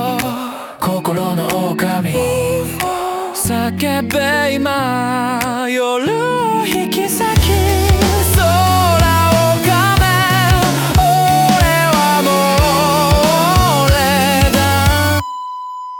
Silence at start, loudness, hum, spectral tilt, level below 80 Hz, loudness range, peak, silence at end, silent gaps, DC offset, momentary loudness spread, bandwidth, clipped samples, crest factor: 0 s; -13 LUFS; none; -4.5 dB/octave; -26 dBFS; 5 LU; 0 dBFS; 0 s; none; under 0.1%; 7 LU; 19 kHz; under 0.1%; 12 dB